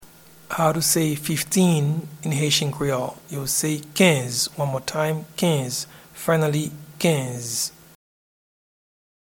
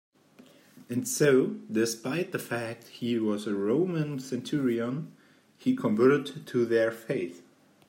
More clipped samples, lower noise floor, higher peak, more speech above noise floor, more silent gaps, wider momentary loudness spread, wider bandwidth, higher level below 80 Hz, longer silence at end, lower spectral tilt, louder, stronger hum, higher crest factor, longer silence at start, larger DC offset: neither; second, -48 dBFS vs -57 dBFS; first, -4 dBFS vs -10 dBFS; about the same, 26 dB vs 29 dB; neither; about the same, 10 LU vs 11 LU; first, 19 kHz vs 16 kHz; first, -58 dBFS vs -76 dBFS; first, 1.55 s vs 0.45 s; second, -4 dB/octave vs -5.5 dB/octave; first, -22 LUFS vs -29 LUFS; neither; about the same, 20 dB vs 18 dB; second, 0 s vs 0.75 s; neither